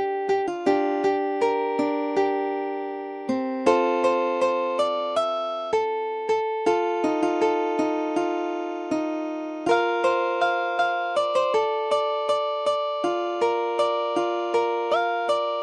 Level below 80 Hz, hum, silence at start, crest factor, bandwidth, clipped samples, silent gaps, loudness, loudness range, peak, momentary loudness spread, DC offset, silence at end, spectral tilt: -70 dBFS; none; 0 s; 18 dB; 11.5 kHz; under 0.1%; none; -24 LUFS; 1 LU; -6 dBFS; 5 LU; under 0.1%; 0 s; -4 dB/octave